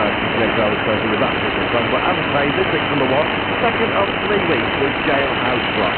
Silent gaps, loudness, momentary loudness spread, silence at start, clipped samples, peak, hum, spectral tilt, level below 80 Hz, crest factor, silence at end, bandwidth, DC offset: none; -17 LUFS; 1 LU; 0 s; under 0.1%; -2 dBFS; none; -10.5 dB/octave; -40 dBFS; 14 dB; 0 s; 4.4 kHz; under 0.1%